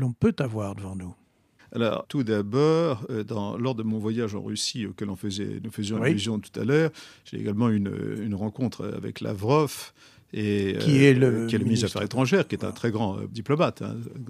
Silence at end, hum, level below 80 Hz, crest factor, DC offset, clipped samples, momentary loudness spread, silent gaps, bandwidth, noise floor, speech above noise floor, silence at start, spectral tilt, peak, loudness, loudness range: 0 s; none; -62 dBFS; 20 dB; under 0.1%; under 0.1%; 12 LU; none; 15 kHz; -60 dBFS; 34 dB; 0 s; -6 dB/octave; -4 dBFS; -26 LUFS; 5 LU